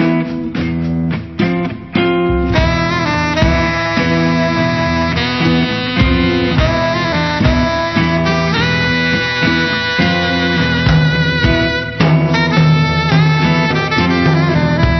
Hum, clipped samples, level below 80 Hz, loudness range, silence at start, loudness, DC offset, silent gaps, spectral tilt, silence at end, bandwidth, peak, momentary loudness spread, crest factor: none; under 0.1%; -26 dBFS; 2 LU; 0 s; -13 LUFS; 0.4%; none; -6.5 dB/octave; 0 s; 6.4 kHz; 0 dBFS; 5 LU; 12 dB